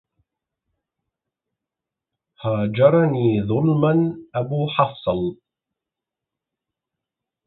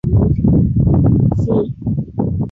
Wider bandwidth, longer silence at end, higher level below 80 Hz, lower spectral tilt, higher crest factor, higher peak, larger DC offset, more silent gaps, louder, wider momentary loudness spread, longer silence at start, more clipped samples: first, 4.1 kHz vs 3.7 kHz; first, 2.15 s vs 0 s; second, -54 dBFS vs -24 dBFS; about the same, -12.5 dB/octave vs -12.5 dB/octave; first, 20 dB vs 10 dB; about the same, -2 dBFS vs -2 dBFS; neither; neither; second, -20 LUFS vs -15 LUFS; about the same, 10 LU vs 8 LU; first, 2.4 s vs 0.05 s; neither